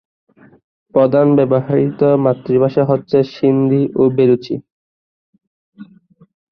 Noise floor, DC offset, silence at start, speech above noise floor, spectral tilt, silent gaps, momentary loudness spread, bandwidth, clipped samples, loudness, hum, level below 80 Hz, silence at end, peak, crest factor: -48 dBFS; under 0.1%; 0.95 s; 35 dB; -10.5 dB/octave; 4.72-5.33 s, 5.47-5.72 s; 5 LU; 6 kHz; under 0.1%; -14 LUFS; none; -56 dBFS; 0.65 s; -2 dBFS; 14 dB